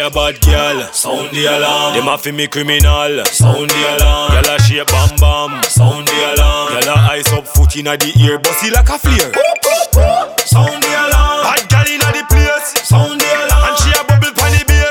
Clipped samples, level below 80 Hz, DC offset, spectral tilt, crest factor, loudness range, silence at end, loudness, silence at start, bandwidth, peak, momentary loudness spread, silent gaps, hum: under 0.1%; -16 dBFS; under 0.1%; -3.5 dB/octave; 10 dB; 1 LU; 0 s; -11 LUFS; 0 s; 19 kHz; 0 dBFS; 4 LU; none; none